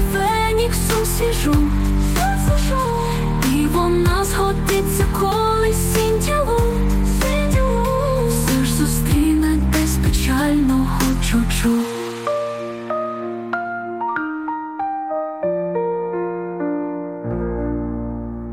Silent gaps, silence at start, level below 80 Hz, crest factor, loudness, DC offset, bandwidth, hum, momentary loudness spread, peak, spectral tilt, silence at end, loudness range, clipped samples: none; 0 s; -24 dBFS; 14 dB; -19 LUFS; under 0.1%; 17 kHz; none; 8 LU; -6 dBFS; -5.5 dB/octave; 0 s; 6 LU; under 0.1%